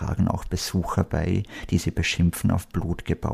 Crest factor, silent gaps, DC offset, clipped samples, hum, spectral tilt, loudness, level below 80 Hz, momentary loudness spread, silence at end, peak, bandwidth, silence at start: 18 dB; none; under 0.1%; under 0.1%; none; -5.5 dB/octave; -25 LUFS; -36 dBFS; 6 LU; 0 s; -8 dBFS; 15.5 kHz; 0 s